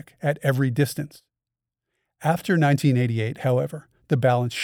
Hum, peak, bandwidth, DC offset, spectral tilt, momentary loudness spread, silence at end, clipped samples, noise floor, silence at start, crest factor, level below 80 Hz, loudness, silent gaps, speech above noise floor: none; -6 dBFS; 17 kHz; under 0.1%; -6.5 dB/octave; 11 LU; 0 s; under 0.1%; -88 dBFS; 0.25 s; 18 dB; -64 dBFS; -23 LUFS; none; 66 dB